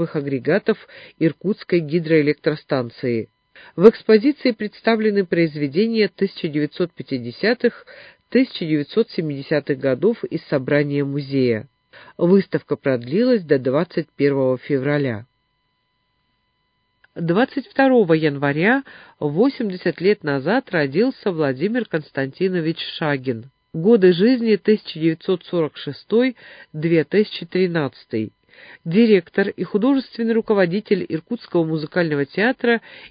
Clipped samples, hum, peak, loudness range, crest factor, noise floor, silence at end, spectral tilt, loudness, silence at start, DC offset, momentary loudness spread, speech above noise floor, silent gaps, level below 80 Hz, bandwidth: under 0.1%; none; 0 dBFS; 4 LU; 20 dB; -69 dBFS; 0.05 s; -10 dB/octave; -20 LUFS; 0 s; under 0.1%; 10 LU; 50 dB; none; -64 dBFS; 5.2 kHz